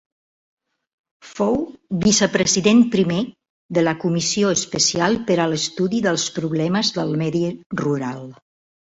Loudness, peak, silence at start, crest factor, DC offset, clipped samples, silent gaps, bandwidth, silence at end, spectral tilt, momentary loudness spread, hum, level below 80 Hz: -19 LUFS; -2 dBFS; 1.25 s; 18 dB; under 0.1%; under 0.1%; 3.50-3.69 s, 7.66-7.70 s; 8.2 kHz; 0.5 s; -4 dB/octave; 9 LU; none; -54 dBFS